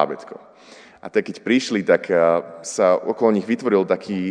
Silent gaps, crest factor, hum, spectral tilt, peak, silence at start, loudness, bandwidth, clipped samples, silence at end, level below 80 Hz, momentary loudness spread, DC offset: none; 18 dB; none; -5 dB/octave; -2 dBFS; 0 s; -20 LUFS; 10 kHz; under 0.1%; 0 s; -70 dBFS; 9 LU; under 0.1%